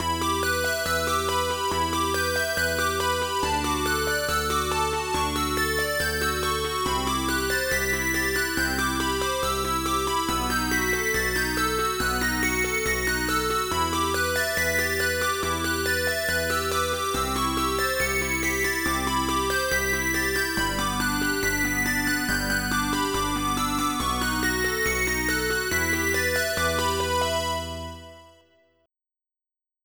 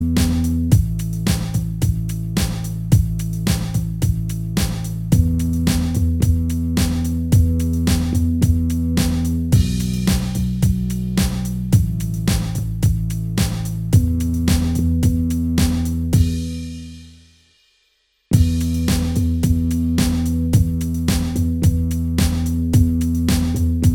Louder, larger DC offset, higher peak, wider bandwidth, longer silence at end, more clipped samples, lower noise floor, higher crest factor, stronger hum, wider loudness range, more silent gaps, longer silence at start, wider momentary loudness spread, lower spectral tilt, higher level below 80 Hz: second, -24 LUFS vs -19 LUFS; neither; second, -12 dBFS vs 0 dBFS; first, over 20 kHz vs 18 kHz; first, 1.55 s vs 0 s; neither; first, under -90 dBFS vs -64 dBFS; about the same, 14 dB vs 18 dB; neither; about the same, 1 LU vs 3 LU; neither; about the same, 0 s vs 0 s; second, 2 LU vs 5 LU; second, -3 dB/octave vs -6 dB/octave; second, -38 dBFS vs -26 dBFS